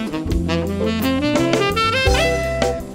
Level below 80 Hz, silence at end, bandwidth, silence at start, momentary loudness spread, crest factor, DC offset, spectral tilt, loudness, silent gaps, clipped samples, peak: -28 dBFS; 0 s; 16 kHz; 0 s; 5 LU; 16 dB; under 0.1%; -5 dB/octave; -18 LUFS; none; under 0.1%; -2 dBFS